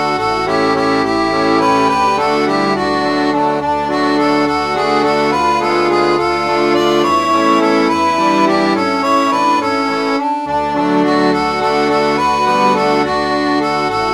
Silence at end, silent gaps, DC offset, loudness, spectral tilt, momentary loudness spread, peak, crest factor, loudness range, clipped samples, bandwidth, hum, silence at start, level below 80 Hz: 0 s; none; 0.2%; -13 LUFS; -5 dB/octave; 3 LU; 0 dBFS; 14 dB; 1 LU; under 0.1%; 14.5 kHz; none; 0 s; -44 dBFS